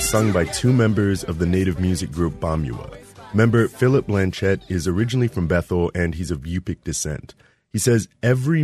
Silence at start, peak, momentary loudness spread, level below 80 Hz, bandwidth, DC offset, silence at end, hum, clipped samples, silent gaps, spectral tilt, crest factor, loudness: 0 s; -4 dBFS; 10 LU; -38 dBFS; 13.5 kHz; under 0.1%; 0 s; none; under 0.1%; none; -6 dB/octave; 18 dB; -21 LUFS